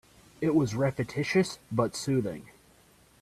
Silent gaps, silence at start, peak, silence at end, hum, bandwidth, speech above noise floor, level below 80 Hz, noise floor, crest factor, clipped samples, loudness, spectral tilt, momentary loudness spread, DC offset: none; 0.4 s; -12 dBFS; 0.8 s; none; 14 kHz; 32 dB; -60 dBFS; -60 dBFS; 18 dB; under 0.1%; -29 LUFS; -6 dB/octave; 6 LU; under 0.1%